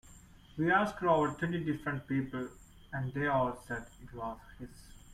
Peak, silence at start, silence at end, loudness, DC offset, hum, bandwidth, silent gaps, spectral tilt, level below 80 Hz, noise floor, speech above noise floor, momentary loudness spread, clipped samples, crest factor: -16 dBFS; 0.1 s; 0 s; -34 LUFS; under 0.1%; none; 15.5 kHz; none; -7 dB/octave; -58 dBFS; -56 dBFS; 23 dB; 19 LU; under 0.1%; 20 dB